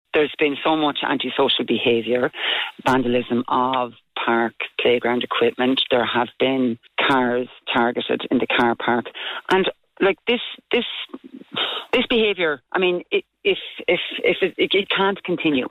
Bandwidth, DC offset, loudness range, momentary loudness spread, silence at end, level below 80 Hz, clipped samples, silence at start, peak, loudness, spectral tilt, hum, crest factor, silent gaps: 12 kHz; under 0.1%; 2 LU; 6 LU; 0 s; -56 dBFS; under 0.1%; 0.15 s; -8 dBFS; -21 LUFS; -5.5 dB/octave; none; 14 dB; none